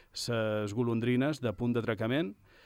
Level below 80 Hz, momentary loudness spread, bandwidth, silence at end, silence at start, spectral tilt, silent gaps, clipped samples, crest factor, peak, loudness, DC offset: -62 dBFS; 4 LU; 15.5 kHz; 0.3 s; 0.15 s; -6 dB/octave; none; under 0.1%; 14 dB; -18 dBFS; -32 LUFS; under 0.1%